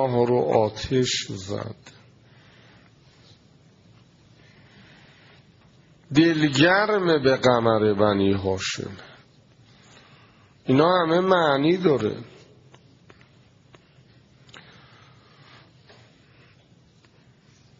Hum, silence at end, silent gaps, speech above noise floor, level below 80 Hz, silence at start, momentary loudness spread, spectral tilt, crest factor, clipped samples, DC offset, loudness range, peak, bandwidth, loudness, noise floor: none; 5.55 s; none; 35 dB; -58 dBFS; 0 s; 14 LU; -4.5 dB/octave; 22 dB; under 0.1%; under 0.1%; 10 LU; -4 dBFS; 7.4 kHz; -21 LUFS; -56 dBFS